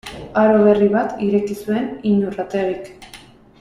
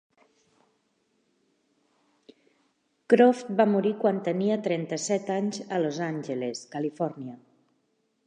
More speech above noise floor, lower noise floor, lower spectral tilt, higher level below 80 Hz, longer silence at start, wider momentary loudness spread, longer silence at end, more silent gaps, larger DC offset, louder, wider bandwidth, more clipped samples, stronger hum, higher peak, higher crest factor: second, 26 dB vs 47 dB; second, -43 dBFS vs -73 dBFS; first, -7.5 dB/octave vs -5.5 dB/octave; first, -50 dBFS vs -84 dBFS; second, 0.05 s vs 3.1 s; about the same, 10 LU vs 12 LU; second, 0.45 s vs 0.9 s; neither; neither; first, -18 LUFS vs -26 LUFS; first, 13 kHz vs 9.8 kHz; neither; neither; first, -2 dBFS vs -6 dBFS; second, 16 dB vs 22 dB